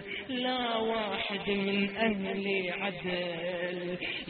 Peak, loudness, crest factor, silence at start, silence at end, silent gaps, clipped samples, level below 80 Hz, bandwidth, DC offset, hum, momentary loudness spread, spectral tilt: -16 dBFS; -32 LUFS; 18 dB; 0 s; 0 s; none; under 0.1%; -62 dBFS; 4.6 kHz; under 0.1%; none; 5 LU; -2.5 dB/octave